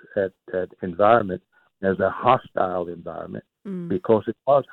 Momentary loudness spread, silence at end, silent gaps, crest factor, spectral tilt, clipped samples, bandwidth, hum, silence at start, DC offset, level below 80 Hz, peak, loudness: 16 LU; 0 s; none; 18 dB; -9.5 dB/octave; under 0.1%; 4.2 kHz; none; 0.15 s; under 0.1%; -60 dBFS; -4 dBFS; -23 LUFS